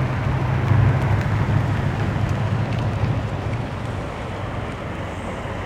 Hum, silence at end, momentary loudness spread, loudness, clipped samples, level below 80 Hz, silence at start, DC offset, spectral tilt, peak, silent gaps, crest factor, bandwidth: none; 0 s; 10 LU; -23 LUFS; under 0.1%; -34 dBFS; 0 s; under 0.1%; -7.5 dB/octave; -6 dBFS; none; 16 dB; 9.6 kHz